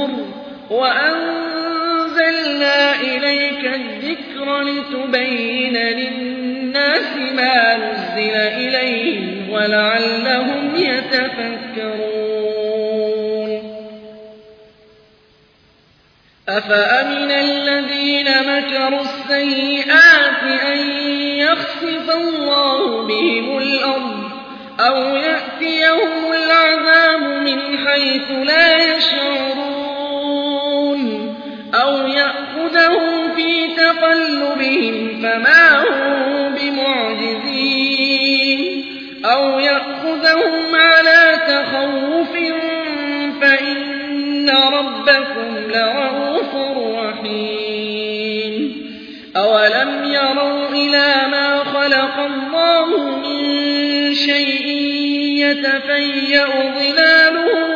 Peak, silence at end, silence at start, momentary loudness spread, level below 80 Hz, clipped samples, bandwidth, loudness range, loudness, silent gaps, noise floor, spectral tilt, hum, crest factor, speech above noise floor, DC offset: 0 dBFS; 0 s; 0 s; 11 LU; -62 dBFS; under 0.1%; 5.4 kHz; 7 LU; -15 LUFS; none; -53 dBFS; -4 dB/octave; none; 16 dB; 38 dB; under 0.1%